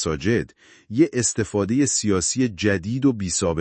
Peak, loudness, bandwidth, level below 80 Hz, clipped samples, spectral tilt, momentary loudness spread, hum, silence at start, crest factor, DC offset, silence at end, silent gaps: -6 dBFS; -21 LUFS; 8.8 kHz; -50 dBFS; under 0.1%; -4.5 dB/octave; 4 LU; none; 0 s; 16 dB; under 0.1%; 0 s; none